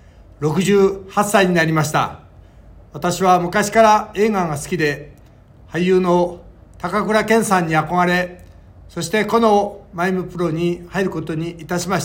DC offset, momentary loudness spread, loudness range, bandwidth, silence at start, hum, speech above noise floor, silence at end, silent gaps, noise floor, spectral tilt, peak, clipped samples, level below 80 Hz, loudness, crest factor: under 0.1%; 11 LU; 3 LU; 16.5 kHz; 0.4 s; none; 28 dB; 0 s; none; -45 dBFS; -5.5 dB/octave; 0 dBFS; under 0.1%; -46 dBFS; -18 LUFS; 18 dB